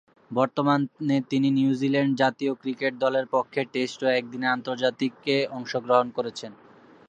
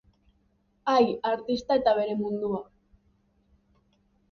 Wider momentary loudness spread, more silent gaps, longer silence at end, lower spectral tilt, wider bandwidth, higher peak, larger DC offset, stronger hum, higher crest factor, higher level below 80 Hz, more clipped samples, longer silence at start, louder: about the same, 7 LU vs 9 LU; neither; second, 0.55 s vs 1.7 s; about the same, -6 dB/octave vs -6 dB/octave; first, 8.4 kHz vs 7 kHz; first, -6 dBFS vs -10 dBFS; neither; neither; about the same, 20 dB vs 20 dB; second, -76 dBFS vs -62 dBFS; neither; second, 0.3 s vs 0.85 s; about the same, -25 LUFS vs -27 LUFS